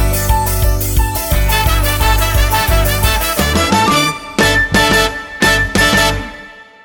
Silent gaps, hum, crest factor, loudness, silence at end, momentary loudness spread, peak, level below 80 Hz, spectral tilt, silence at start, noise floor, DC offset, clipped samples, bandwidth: none; none; 12 dB; -13 LUFS; 0.2 s; 5 LU; 0 dBFS; -18 dBFS; -3.5 dB/octave; 0 s; -35 dBFS; under 0.1%; under 0.1%; 19.5 kHz